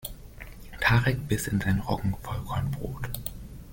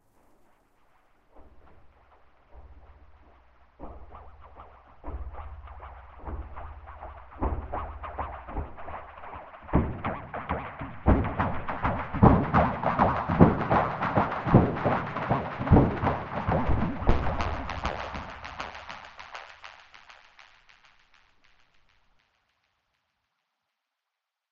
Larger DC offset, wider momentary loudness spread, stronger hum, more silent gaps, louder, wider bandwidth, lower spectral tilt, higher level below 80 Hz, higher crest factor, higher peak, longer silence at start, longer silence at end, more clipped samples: neither; about the same, 21 LU vs 23 LU; neither; neither; about the same, -28 LUFS vs -27 LUFS; first, 17 kHz vs 7 kHz; second, -5.5 dB/octave vs -9 dB/octave; about the same, -42 dBFS vs -38 dBFS; second, 18 dB vs 28 dB; second, -10 dBFS vs -2 dBFS; second, 0 s vs 1.4 s; second, 0 s vs 4.1 s; neither